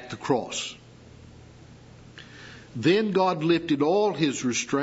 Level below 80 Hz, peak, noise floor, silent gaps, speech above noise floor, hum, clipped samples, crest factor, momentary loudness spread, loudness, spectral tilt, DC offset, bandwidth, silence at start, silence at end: -60 dBFS; -10 dBFS; -48 dBFS; none; 24 dB; none; under 0.1%; 18 dB; 22 LU; -25 LUFS; -4.5 dB/octave; under 0.1%; 8 kHz; 0 s; 0 s